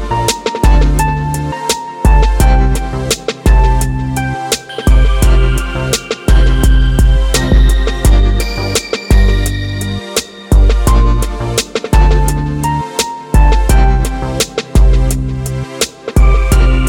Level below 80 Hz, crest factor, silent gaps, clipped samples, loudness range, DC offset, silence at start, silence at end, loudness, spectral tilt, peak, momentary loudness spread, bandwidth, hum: -12 dBFS; 10 dB; none; under 0.1%; 2 LU; under 0.1%; 0 s; 0 s; -13 LUFS; -5 dB/octave; 0 dBFS; 7 LU; 17 kHz; none